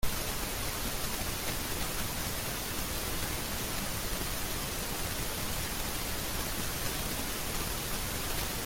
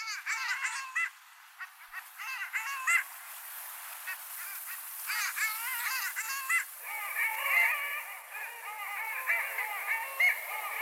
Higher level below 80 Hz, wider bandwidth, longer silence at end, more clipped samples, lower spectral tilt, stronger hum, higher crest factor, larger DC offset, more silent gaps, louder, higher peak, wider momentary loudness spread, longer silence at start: first, -42 dBFS vs under -90 dBFS; about the same, 17 kHz vs 17.5 kHz; about the same, 0 s vs 0 s; neither; first, -2.5 dB/octave vs 7.5 dB/octave; neither; about the same, 16 dB vs 20 dB; neither; neither; about the same, -34 LUFS vs -32 LUFS; about the same, -18 dBFS vs -16 dBFS; second, 1 LU vs 14 LU; about the same, 0 s vs 0 s